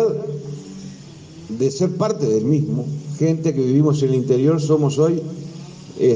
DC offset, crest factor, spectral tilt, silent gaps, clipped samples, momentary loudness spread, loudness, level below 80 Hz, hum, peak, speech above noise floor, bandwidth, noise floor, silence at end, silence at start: under 0.1%; 14 dB; -7.5 dB/octave; none; under 0.1%; 19 LU; -19 LUFS; -60 dBFS; none; -4 dBFS; 21 dB; 9.6 kHz; -39 dBFS; 0 s; 0 s